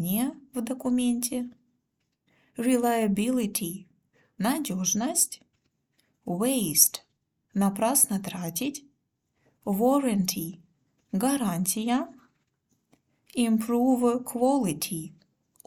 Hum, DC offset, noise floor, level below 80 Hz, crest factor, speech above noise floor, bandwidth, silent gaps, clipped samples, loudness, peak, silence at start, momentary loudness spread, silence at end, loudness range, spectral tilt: none; under 0.1%; -78 dBFS; -66 dBFS; 26 dB; 52 dB; 18.5 kHz; none; under 0.1%; -26 LUFS; -2 dBFS; 0 s; 14 LU; 0.6 s; 4 LU; -4 dB/octave